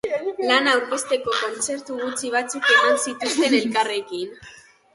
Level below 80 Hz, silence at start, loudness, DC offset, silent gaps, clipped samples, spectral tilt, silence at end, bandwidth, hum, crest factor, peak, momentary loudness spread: -66 dBFS; 0.05 s; -21 LUFS; under 0.1%; none; under 0.1%; -1.5 dB/octave; 0.4 s; 11.5 kHz; none; 18 dB; -4 dBFS; 11 LU